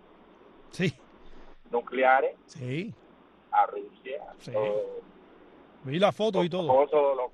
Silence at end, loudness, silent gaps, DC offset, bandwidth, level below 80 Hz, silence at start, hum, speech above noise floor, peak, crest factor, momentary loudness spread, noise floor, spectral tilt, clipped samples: 0.05 s; -27 LUFS; none; under 0.1%; 11 kHz; -60 dBFS; 0.75 s; none; 30 dB; -8 dBFS; 20 dB; 17 LU; -57 dBFS; -6.5 dB/octave; under 0.1%